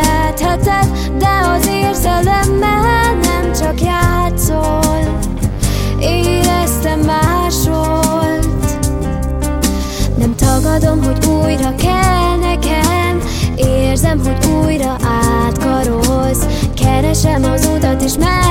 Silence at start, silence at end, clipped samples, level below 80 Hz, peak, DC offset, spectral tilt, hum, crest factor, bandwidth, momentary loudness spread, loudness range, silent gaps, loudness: 0 s; 0 s; under 0.1%; -18 dBFS; 0 dBFS; under 0.1%; -5 dB/octave; none; 12 dB; 17 kHz; 4 LU; 2 LU; none; -13 LUFS